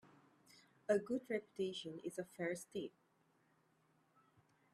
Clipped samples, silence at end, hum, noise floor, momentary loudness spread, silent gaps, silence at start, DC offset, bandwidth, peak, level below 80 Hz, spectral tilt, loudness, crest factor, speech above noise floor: under 0.1%; 1.85 s; none; -77 dBFS; 10 LU; none; 0.05 s; under 0.1%; 14 kHz; -24 dBFS; -86 dBFS; -5 dB/octave; -44 LUFS; 22 dB; 34 dB